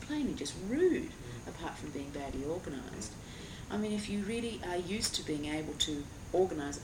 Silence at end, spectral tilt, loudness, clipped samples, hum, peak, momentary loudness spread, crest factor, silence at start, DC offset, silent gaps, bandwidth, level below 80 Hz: 0 s; -4 dB/octave; -36 LUFS; under 0.1%; none; -18 dBFS; 12 LU; 18 dB; 0 s; under 0.1%; none; 17 kHz; -54 dBFS